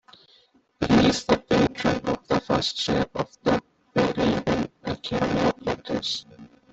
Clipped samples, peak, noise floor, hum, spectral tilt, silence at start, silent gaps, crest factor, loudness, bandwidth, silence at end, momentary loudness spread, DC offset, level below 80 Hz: under 0.1%; -6 dBFS; -60 dBFS; none; -5.5 dB/octave; 0.8 s; none; 20 dB; -24 LUFS; 8.2 kHz; 0.25 s; 9 LU; under 0.1%; -48 dBFS